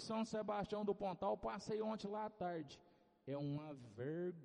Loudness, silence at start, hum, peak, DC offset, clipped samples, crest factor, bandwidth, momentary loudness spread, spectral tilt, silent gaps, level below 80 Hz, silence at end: -45 LUFS; 0 s; none; -28 dBFS; under 0.1%; under 0.1%; 16 dB; 10 kHz; 8 LU; -6.5 dB/octave; none; -72 dBFS; 0 s